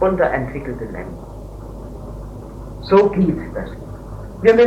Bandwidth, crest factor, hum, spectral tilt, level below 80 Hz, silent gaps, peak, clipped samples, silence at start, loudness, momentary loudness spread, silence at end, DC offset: 10.5 kHz; 18 dB; none; -8 dB/octave; -36 dBFS; none; 0 dBFS; under 0.1%; 0 s; -19 LUFS; 20 LU; 0 s; under 0.1%